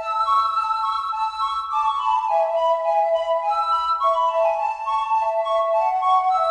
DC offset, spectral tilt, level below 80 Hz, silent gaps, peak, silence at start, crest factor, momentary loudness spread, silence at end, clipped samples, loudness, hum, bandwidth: under 0.1%; 0 dB/octave; -58 dBFS; none; -8 dBFS; 0 s; 12 dB; 4 LU; 0 s; under 0.1%; -21 LUFS; none; 9.8 kHz